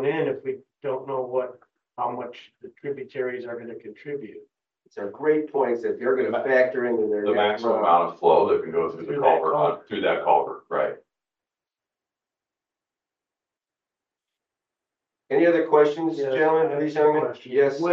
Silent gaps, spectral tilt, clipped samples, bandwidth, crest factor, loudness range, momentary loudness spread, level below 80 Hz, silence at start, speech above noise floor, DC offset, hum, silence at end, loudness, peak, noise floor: none; -7 dB/octave; under 0.1%; 7 kHz; 20 dB; 12 LU; 16 LU; -78 dBFS; 0 s; 67 dB; under 0.1%; none; 0 s; -23 LUFS; -6 dBFS; -90 dBFS